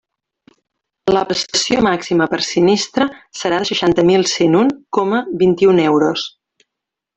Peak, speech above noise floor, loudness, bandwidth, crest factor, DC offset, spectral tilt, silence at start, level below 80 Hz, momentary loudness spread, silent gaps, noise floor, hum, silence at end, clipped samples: 0 dBFS; 67 dB; -15 LUFS; 8.4 kHz; 16 dB; under 0.1%; -4.5 dB/octave; 1.05 s; -50 dBFS; 7 LU; none; -82 dBFS; none; 0.9 s; under 0.1%